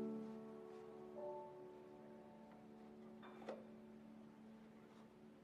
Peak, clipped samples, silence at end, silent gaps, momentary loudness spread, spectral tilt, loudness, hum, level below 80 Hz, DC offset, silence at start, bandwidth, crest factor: -36 dBFS; under 0.1%; 0 s; none; 10 LU; -7.5 dB/octave; -57 LUFS; none; -88 dBFS; under 0.1%; 0 s; 13.5 kHz; 20 dB